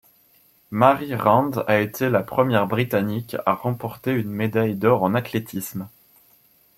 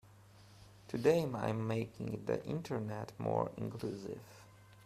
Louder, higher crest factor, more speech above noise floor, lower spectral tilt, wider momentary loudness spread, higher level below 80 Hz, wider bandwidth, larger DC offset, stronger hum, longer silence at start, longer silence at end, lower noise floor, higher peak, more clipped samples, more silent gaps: first, -22 LUFS vs -38 LUFS; about the same, 22 dB vs 22 dB; first, 37 dB vs 23 dB; about the same, -7 dB/octave vs -7 dB/octave; second, 11 LU vs 16 LU; first, -60 dBFS vs -68 dBFS; first, 16.5 kHz vs 14 kHz; neither; neither; first, 0.7 s vs 0.05 s; first, 0.9 s vs 0 s; about the same, -58 dBFS vs -60 dBFS; first, -2 dBFS vs -16 dBFS; neither; neither